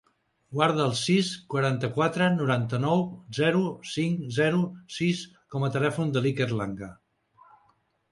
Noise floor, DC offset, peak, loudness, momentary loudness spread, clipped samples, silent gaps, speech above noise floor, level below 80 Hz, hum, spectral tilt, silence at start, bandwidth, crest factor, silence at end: -67 dBFS; under 0.1%; -8 dBFS; -27 LUFS; 9 LU; under 0.1%; none; 41 dB; -64 dBFS; none; -6 dB/octave; 0.5 s; 11.5 kHz; 20 dB; 1.2 s